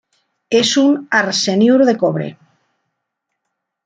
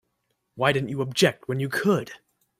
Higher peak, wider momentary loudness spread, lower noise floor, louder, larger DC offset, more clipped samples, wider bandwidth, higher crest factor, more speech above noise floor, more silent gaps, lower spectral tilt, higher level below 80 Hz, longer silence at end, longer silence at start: first, -2 dBFS vs -6 dBFS; about the same, 7 LU vs 6 LU; about the same, -76 dBFS vs -75 dBFS; first, -14 LUFS vs -24 LUFS; neither; neither; second, 9.4 kHz vs 16 kHz; about the same, 16 dB vs 20 dB; first, 62 dB vs 51 dB; neither; about the same, -4 dB/octave vs -5 dB/octave; about the same, -62 dBFS vs -64 dBFS; first, 1.55 s vs 0.45 s; about the same, 0.5 s vs 0.55 s